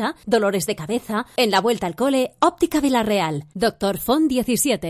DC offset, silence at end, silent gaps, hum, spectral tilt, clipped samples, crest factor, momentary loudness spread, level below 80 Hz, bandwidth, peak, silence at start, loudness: under 0.1%; 0 s; none; none; -4 dB/octave; under 0.1%; 16 dB; 6 LU; -50 dBFS; 16 kHz; -6 dBFS; 0 s; -20 LUFS